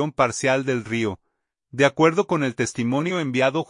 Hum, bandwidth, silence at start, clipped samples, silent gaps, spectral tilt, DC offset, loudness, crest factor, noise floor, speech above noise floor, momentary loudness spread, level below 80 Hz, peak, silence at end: none; 11 kHz; 0 s; under 0.1%; none; -5 dB/octave; under 0.1%; -22 LUFS; 18 dB; -75 dBFS; 54 dB; 8 LU; -62 dBFS; -4 dBFS; 0.05 s